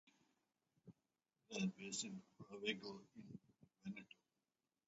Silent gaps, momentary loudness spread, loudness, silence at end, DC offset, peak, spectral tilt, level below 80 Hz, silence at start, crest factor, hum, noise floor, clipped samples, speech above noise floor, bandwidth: none; 23 LU; -49 LUFS; 0.85 s; under 0.1%; -28 dBFS; -4 dB/octave; -88 dBFS; 0.05 s; 24 dB; none; under -90 dBFS; under 0.1%; over 41 dB; 7.6 kHz